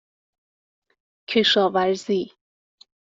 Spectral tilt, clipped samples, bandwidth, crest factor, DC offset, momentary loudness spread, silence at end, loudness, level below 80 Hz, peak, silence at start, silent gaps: -4 dB/octave; under 0.1%; 7.8 kHz; 18 dB; under 0.1%; 9 LU; 0.85 s; -21 LUFS; -68 dBFS; -6 dBFS; 1.3 s; none